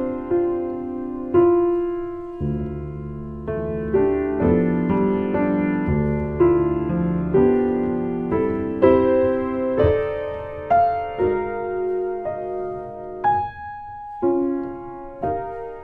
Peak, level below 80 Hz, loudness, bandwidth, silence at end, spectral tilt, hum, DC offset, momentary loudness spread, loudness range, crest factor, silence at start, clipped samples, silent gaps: -2 dBFS; -40 dBFS; -22 LUFS; 4.4 kHz; 0 s; -11 dB/octave; none; under 0.1%; 13 LU; 6 LU; 20 dB; 0 s; under 0.1%; none